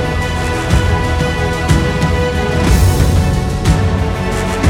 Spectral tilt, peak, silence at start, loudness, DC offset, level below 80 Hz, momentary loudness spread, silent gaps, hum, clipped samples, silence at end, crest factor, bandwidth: -6 dB/octave; 0 dBFS; 0 s; -14 LUFS; under 0.1%; -20 dBFS; 5 LU; none; none; under 0.1%; 0 s; 12 dB; 18 kHz